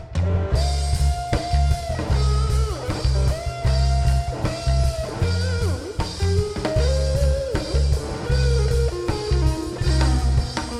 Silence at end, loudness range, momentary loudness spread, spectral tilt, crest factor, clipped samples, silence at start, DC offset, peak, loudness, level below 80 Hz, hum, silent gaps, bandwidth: 0 s; 1 LU; 5 LU; -6 dB/octave; 14 dB; under 0.1%; 0 s; under 0.1%; -6 dBFS; -22 LUFS; -22 dBFS; none; none; 12 kHz